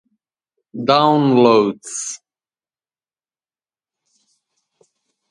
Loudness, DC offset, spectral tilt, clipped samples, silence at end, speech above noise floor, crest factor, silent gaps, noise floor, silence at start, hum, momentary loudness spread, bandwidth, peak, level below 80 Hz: -15 LUFS; under 0.1%; -5 dB/octave; under 0.1%; 3.15 s; over 75 dB; 20 dB; none; under -90 dBFS; 0.75 s; none; 18 LU; 11.5 kHz; 0 dBFS; -68 dBFS